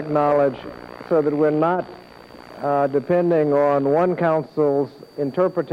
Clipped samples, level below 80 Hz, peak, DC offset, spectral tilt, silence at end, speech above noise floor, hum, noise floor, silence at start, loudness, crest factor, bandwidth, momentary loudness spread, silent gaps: under 0.1%; -60 dBFS; -8 dBFS; under 0.1%; -9 dB/octave; 0 s; 23 dB; none; -42 dBFS; 0 s; -20 LUFS; 12 dB; 6.6 kHz; 11 LU; none